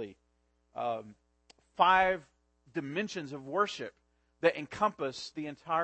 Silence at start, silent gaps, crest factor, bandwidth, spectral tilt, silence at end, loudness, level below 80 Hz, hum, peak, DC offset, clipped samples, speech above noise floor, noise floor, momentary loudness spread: 0 s; none; 24 dB; 8.4 kHz; -4.5 dB/octave; 0 s; -32 LUFS; -66 dBFS; none; -10 dBFS; under 0.1%; under 0.1%; 42 dB; -74 dBFS; 16 LU